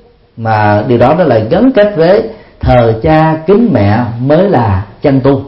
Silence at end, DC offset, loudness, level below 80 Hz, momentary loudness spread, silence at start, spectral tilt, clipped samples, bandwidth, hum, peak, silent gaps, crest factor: 0 s; under 0.1%; -9 LUFS; -30 dBFS; 6 LU; 0.35 s; -10.5 dB/octave; 0.3%; 5.8 kHz; none; 0 dBFS; none; 8 dB